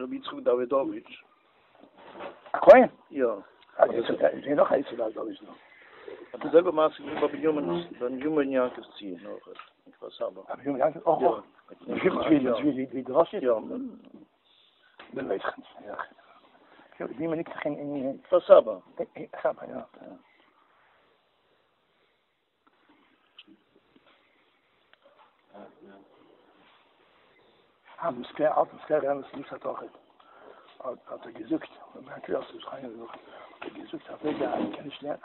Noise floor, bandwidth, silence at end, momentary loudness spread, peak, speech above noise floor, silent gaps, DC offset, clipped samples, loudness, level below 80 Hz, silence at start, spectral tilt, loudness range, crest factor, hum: -74 dBFS; 4.3 kHz; 0.1 s; 20 LU; -4 dBFS; 47 dB; none; under 0.1%; under 0.1%; -27 LUFS; -70 dBFS; 0 s; -4.5 dB/octave; 15 LU; 26 dB; none